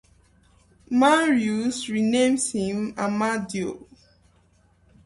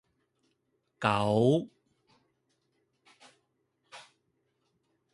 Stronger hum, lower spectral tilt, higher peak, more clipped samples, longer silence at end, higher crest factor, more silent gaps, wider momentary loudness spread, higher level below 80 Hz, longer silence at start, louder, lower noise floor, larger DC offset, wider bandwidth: neither; second, -4 dB/octave vs -7 dB/octave; first, -6 dBFS vs -10 dBFS; neither; first, 1.3 s vs 1.15 s; second, 18 dB vs 26 dB; neither; second, 11 LU vs 26 LU; first, -60 dBFS vs -68 dBFS; about the same, 0.9 s vs 1 s; first, -23 LUFS vs -28 LUFS; second, -60 dBFS vs -77 dBFS; neither; about the same, 11.5 kHz vs 11.5 kHz